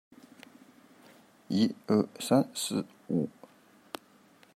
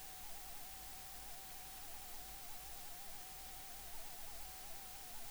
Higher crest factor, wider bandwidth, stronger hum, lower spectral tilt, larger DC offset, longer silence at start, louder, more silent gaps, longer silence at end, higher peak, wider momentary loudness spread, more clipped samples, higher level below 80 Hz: first, 20 dB vs 14 dB; second, 16 kHz vs over 20 kHz; neither; first, -5.5 dB/octave vs -1 dB/octave; neither; first, 1.5 s vs 0 s; first, -30 LUFS vs -49 LUFS; neither; first, 1.25 s vs 0 s; first, -12 dBFS vs -36 dBFS; first, 19 LU vs 0 LU; neither; second, -78 dBFS vs -60 dBFS